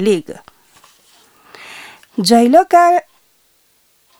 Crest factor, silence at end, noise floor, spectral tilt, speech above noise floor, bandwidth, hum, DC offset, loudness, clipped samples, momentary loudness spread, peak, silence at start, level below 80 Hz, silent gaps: 16 dB; 1.2 s; -57 dBFS; -4.5 dB/octave; 45 dB; 17.5 kHz; none; under 0.1%; -12 LUFS; under 0.1%; 25 LU; 0 dBFS; 0 s; -62 dBFS; none